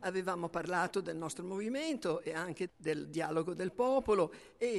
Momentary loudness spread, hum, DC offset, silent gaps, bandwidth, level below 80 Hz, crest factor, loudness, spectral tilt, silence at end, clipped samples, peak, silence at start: 7 LU; none; under 0.1%; none; 12 kHz; -66 dBFS; 16 dB; -36 LUFS; -5 dB/octave; 0 s; under 0.1%; -20 dBFS; 0 s